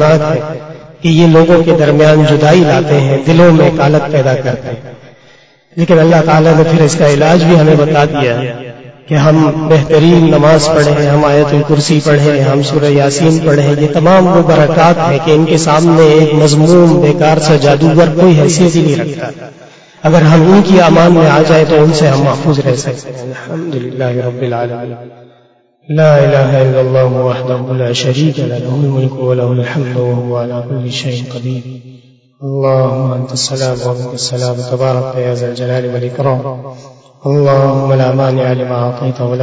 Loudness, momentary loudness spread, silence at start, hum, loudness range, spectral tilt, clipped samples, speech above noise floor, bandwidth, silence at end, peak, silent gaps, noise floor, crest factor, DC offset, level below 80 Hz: -9 LUFS; 13 LU; 0 s; none; 8 LU; -6.5 dB/octave; 0.8%; 40 dB; 8 kHz; 0 s; 0 dBFS; none; -49 dBFS; 8 dB; under 0.1%; -42 dBFS